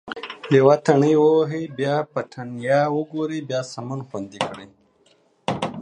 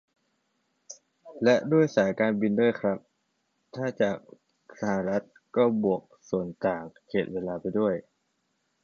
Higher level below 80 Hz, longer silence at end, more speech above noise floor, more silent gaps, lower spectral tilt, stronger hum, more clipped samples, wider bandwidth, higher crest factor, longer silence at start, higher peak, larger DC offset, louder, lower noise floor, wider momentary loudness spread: about the same, -64 dBFS vs -66 dBFS; second, 0 s vs 0.8 s; second, 39 dB vs 49 dB; neither; about the same, -6.5 dB/octave vs -7 dB/octave; neither; neither; first, 10 kHz vs 7.2 kHz; about the same, 20 dB vs 20 dB; second, 0.05 s vs 0.9 s; first, -2 dBFS vs -10 dBFS; neither; first, -21 LUFS vs -27 LUFS; second, -60 dBFS vs -75 dBFS; first, 16 LU vs 13 LU